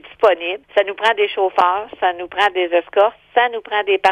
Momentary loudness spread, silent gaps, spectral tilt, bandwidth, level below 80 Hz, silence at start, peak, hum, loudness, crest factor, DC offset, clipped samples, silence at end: 5 LU; none; -3 dB/octave; 10.5 kHz; -60 dBFS; 0.05 s; -2 dBFS; none; -17 LUFS; 14 dB; under 0.1%; under 0.1%; 0 s